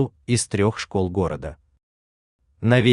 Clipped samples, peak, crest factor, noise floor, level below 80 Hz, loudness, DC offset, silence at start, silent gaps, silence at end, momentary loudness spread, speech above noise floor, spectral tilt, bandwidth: under 0.1%; -4 dBFS; 18 dB; under -90 dBFS; -48 dBFS; -23 LUFS; under 0.1%; 0 s; 1.83-2.39 s; 0 s; 9 LU; over 69 dB; -5.5 dB/octave; 11 kHz